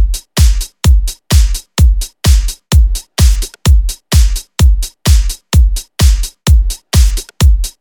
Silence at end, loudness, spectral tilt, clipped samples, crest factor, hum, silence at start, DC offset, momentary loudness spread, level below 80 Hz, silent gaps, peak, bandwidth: 0.1 s; -13 LUFS; -4.5 dB/octave; 0.2%; 10 dB; none; 0 s; under 0.1%; 3 LU; -10 dBFS; none; 0 dBFS; 19 kHz